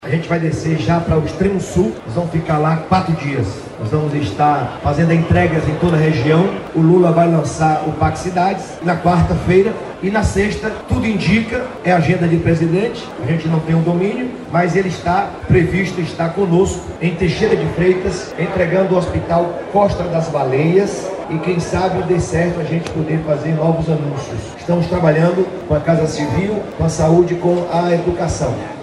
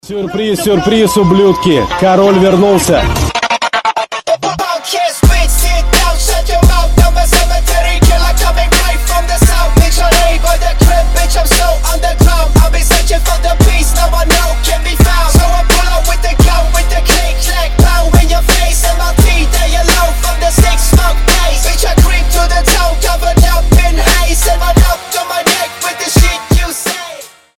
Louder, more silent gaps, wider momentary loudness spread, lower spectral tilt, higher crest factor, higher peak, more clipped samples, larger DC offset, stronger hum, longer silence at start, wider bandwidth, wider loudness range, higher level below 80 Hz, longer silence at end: second, -16 LUFS vs -10 LUFS; neither; about the same, 7 LU vs 5 LU; first, -7 dB/octave vs -4 dB/octave; first, 14 dB vs 8 dB; about the same, -2 dBFS vs 0 dBFS; second, under 0.1% vs 0.4%; neither; neither; about the same, 0 s vs 0.05 s; second, 11 kHz vs 17.5 kHz; about the same, 3 LU vs 1 LU; second, -34 dBFS vs -10 dBFS; second, 0 s vs 0.3 s